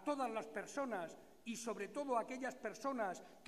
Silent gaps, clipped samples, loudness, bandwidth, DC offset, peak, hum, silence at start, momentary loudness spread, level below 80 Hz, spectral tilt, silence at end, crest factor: none; under 0.1%; -44 LUFS; 15 kHz; under 0.1%; -26 dBFS; none; 0 s; 6 LU; -82 dBFS; -4 dB/octave; 0 s; 18 dB